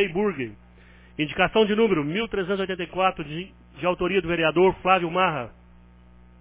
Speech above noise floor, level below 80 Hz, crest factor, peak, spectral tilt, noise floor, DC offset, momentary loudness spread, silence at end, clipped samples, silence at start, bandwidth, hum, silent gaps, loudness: 27 dB; -50 dBFS; 20 dB; -6 dBFS; -9.5 dB/octave; -51 dBFS; under 0.1%; 14 LU; 0.9 s; under 0.1%; 0 s; 4 kHz; 60 Hz at -50 dBFS; none; -23 LUFS